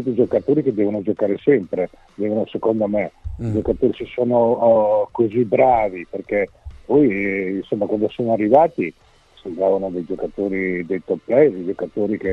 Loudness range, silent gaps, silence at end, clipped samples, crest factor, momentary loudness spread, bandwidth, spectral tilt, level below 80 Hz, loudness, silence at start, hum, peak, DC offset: 3 LU; none; 0 s; under 0.1%; 18 dB; 11 LU; 5.8 kHz; -9.5 dB/octave; -44 dBFS; -19 LUFS; 0 s; none; 0 dBFS; under 0.1%